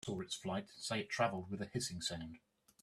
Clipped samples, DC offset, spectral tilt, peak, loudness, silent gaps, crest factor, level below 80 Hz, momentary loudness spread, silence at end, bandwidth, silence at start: under 0.1%; under 0.1%; -4 dB/octave; -22 dBFS; -41 LUFS; none; 20 dB; -70 dBFS; 10 LU; 0.45 s; 13.5 kHz; 0.05 s